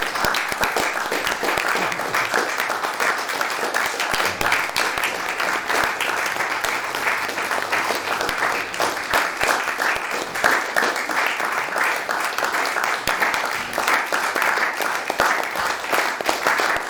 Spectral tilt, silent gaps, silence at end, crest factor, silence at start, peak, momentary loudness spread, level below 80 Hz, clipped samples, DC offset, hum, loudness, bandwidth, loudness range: -1 dB/octave; none; 0 s; 20 dB; 0 s; -2 dBFS; 3 LU; -52 dBFS; under 0.1%; under 0.1%; none; -21 LUFS; over 20 kHz; 1 LU